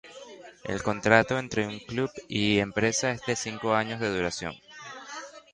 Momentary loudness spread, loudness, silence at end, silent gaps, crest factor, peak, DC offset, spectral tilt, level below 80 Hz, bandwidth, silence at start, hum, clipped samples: 20 LU; -27 LUFS; 0.15 s; none; 24 dB; -4 dBFS; under 0.1%; -4 dB/octave; -56 dBFS; 11 kHz; 0.05 s; none; under 0.1%